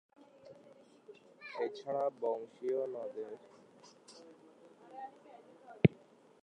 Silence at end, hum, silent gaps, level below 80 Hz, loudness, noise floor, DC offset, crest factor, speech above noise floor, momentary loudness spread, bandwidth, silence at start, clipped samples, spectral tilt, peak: 0.45 s; none; none; -68 dBFS; -37 LUFS; -62 dBFS; under 0.1%; 30 dB; 24 dB; 28 LU; 10 kHz; 0.45 s; under 0.1%; -8.5 dB/octave; -10 dBFS